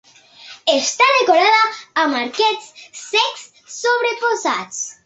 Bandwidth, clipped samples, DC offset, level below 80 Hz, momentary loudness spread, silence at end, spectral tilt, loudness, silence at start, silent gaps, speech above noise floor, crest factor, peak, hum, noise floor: 8.2 kHz; under 0.1%; under 0.1%; -70 dBFS; 15 LU; 0.15 s; 0 dB/octave; -16 LUFS; 0.4 s; none; 25 dB; 16 dB; -2 dBFS; none; -42 dBFS